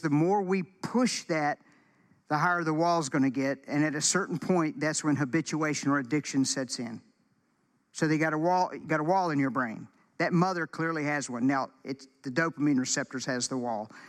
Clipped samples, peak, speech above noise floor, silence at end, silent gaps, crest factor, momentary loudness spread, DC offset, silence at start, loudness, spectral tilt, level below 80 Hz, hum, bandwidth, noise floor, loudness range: under 0.1%; -12 dBFS; 43 dB; 0 s; none; 16 dB; 8 LU; under 0.1%; 0 s; -29 LUFS; -4.5 dB/octave; -78 dBFS; none; 13 kHz; -72 dBFS; 2 LU